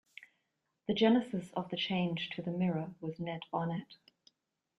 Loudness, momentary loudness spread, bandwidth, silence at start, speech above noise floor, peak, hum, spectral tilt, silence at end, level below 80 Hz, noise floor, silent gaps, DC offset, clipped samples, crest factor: -35 LUFS; 14 LU; 11 kHz; 0.2 s; 49 dB; -16 dBFS; none; -7.5 dB/octave; 0.85 s; -74 dBFS; -83 dBFS; none; under 0.1%; under 0.1%; 20 dB